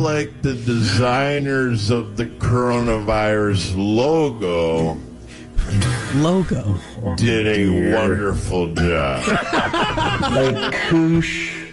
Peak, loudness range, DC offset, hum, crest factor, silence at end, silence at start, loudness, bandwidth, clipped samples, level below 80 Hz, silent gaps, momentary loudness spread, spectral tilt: -6 dBFS; 2 LU; under 0.1%; none; 12 dB; 0 s; 0 s; -19 LUFS; 11.5 kHz; under 0.1%; -34 dBFS; none; 7 LU; -6 dB/octave